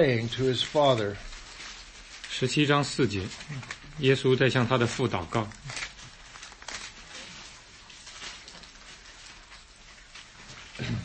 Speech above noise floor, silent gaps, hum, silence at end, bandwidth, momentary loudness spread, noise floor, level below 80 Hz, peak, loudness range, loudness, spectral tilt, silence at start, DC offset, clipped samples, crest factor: 25 dB; none; none; 0 s; 8.8 kHz; 23 LU; -51 dBFS; -54 dBFS; -8 dBFS; 18 LU; -27 LUFS; -5 dB/octave; 0 s; under 0.1%; under 0.1%; 22 dB